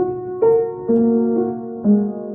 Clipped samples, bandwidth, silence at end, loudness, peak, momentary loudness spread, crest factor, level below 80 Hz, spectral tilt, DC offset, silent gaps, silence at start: under 0.1%; 2.4 kHz; 0 s; -18 LUFS; -6 dBFS; 6 LU; 12 dB; -58 dBFS; -13.5 dB/octave; under 0.1%; none; 0 s